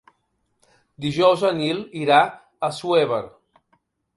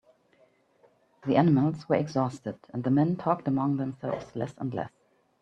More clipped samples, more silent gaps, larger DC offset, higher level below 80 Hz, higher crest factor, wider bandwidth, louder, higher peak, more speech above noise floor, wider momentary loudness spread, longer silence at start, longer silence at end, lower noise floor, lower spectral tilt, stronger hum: neither; neither; neither; about the same, -62 dBFS vs -66 dBFS; about the same, 20 dB vs 22 dB; first, 11.5 kHz vs 8.4 kHz; first, -21 LUFS vs -28 LUFS; first, -2 dBFS vs -6 dBFS; first, 51 dB vs 37 dB; about the same, 11 LU vs 13 LU; second, 1 s vs 1.25 s; first, 0.9 s vs 0.55 s; first, -71 dBFS vs -64 dBFS; second, -5.5 dB/octave vs -9 dB/octave; neither